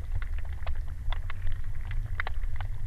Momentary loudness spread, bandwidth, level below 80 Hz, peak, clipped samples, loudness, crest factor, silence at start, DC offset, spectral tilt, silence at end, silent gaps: 3 LU; 4.3 kHz; -30 dBFS; -14 dBFS; under 0.1%; -37 LUFS; 14 dB; 0 s; under 0.1%; -6 dB/octave; 0 s; none